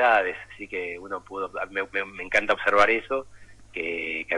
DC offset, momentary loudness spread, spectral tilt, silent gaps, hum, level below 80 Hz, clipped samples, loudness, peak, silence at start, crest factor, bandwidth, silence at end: under 0.1%; 14 LU; -3.5 dB/octave; none; none; -54 dBFS; under 0.1%; -26 LUFS; -8 dBFS; 0 s; 18 dB; 11.5 kHz; 0 s